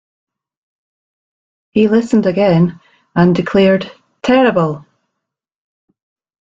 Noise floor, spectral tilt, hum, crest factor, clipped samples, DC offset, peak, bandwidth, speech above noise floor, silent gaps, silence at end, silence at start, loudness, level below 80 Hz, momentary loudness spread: -79 dBFS; -7.5 dB/octave; none; 14 dB; under 0.1%; under 0.1%; -2 dBFS; 7.6 kHz; 67 dB; none; 1.6 s; 1.75 s; -13 LUFS; -50 dBFS; 10 LU